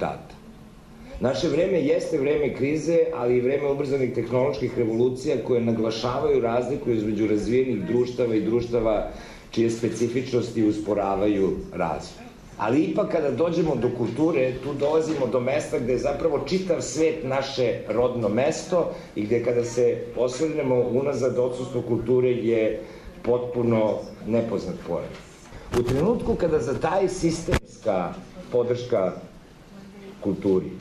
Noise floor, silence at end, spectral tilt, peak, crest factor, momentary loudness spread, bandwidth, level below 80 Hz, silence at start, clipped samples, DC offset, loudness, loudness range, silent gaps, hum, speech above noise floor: -46 dBFS; 0 s; -6.5 dB/octave; -12 dBFS; 12 dB; 8 LU; 12.5 kHz; -46 dBFS; 0 s; under 0.1%; under 0.1%; -24 LUFS; 2 LU; none; none; 23 dB